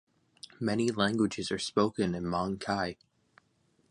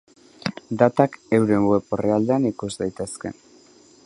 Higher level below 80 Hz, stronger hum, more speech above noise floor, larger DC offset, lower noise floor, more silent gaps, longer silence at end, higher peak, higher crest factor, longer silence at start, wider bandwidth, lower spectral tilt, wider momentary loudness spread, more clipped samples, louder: about the same, -60 dBFS vs -56 dBFS; neither; first, 41 dB vs 31 dB; neither; first, -71 dBFS vs -52 dBFS; neither; first, 1 s vs 0.75 s; second, -10 dBFS vs -2 dBFS; about the same, 22 dB vs 22 dB; first, 0.6 s vs 0.45 s; about the same, 11 kHz vs 11.5 kHz; second, -5 dB/octave vs -6.5 dB/octave; about the same, 11 LU vs 13 LU; neither; second, -31 LUFS vs -22 LUFS